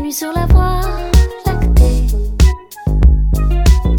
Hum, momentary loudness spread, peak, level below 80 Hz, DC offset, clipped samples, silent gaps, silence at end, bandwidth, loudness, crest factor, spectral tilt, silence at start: none; 7 LU; 0 dBFS; -12 dBFS; under 0.1%; under 0.1%; none; 0 s; 17 kHz; -14 LUFS; 12 dB; -6 dB/octave; 0 s